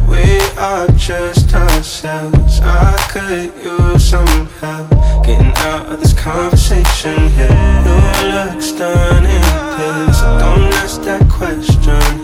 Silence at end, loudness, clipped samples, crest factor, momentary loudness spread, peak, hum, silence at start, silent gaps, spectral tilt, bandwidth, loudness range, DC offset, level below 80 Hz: 0 s; -12 LUFS; 0.5%; 10 dB; 7 LU; 0 dBFS; none; 0 s; none; -5.5 dB/octave; 16.5 kHz; 2 LU; under 0.1%; -12 dBFS